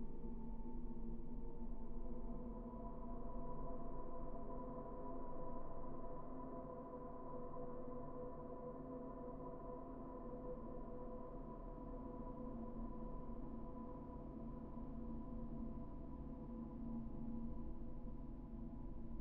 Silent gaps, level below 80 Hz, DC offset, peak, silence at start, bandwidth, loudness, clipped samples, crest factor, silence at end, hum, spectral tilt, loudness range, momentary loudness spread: none; -52 dBFS; under 0.1%; -34 dBFS; 0 s; 2.2 kHz; -52 LUFS; under 0.1%; 14 dB; 0 s; none; -10.5 dB/octave; 1 LU; 3 LU